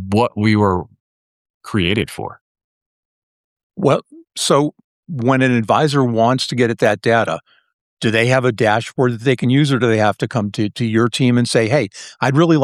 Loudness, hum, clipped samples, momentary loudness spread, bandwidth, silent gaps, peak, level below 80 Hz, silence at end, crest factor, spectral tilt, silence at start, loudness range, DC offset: -16 LUFS; none; under 0.1%; 8 LU; 13.5 kHz; 1.00-1.61 s, 2.41-2.55 s, 2.64-3.56 s, 3.63-3.70 s, 4.84-5.03 s, 7.73-7.97 s; -2 dBFS; -52 dBFS; 0 s; 16 dB; -6 dB/octave; 0 s; 6 LU; under 0.1%